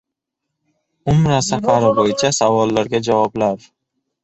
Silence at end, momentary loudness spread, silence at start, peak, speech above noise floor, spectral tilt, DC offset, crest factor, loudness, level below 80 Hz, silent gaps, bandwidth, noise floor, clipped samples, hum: 0.65 s; 6 LU; 1.05 s; -2 dBFS; 64 dB; -5 dB/octave; under 0.1%; 16 dB; -16 LUFS; -46 dBFS; none; 8.2 kHz; -79 dBFS; under 0.1%; none